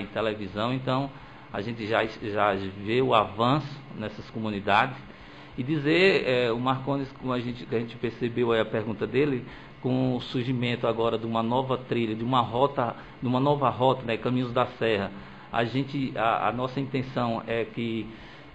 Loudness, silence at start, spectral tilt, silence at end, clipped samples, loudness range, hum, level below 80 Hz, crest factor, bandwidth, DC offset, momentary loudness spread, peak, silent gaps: -27 LUFS; 0 s; -7.5 dB/octave; 0.05 s; under 0.1%; 3 LU; none; -56 dBFS; 20 dB; 8.6 kHz; 0.2%; 11 LU; -8 dBFS; none